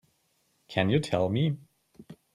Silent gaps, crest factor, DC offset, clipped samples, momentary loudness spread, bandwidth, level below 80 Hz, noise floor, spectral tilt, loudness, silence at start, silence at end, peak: none; 20 dB; under 0.1%; under 0.1%; 7 LU; 12 kHz; -64 dBFS; -72 dBFS; -7 dB/octave; -28 LUFS; 0.7 s; 0.2 s; -10 dBFS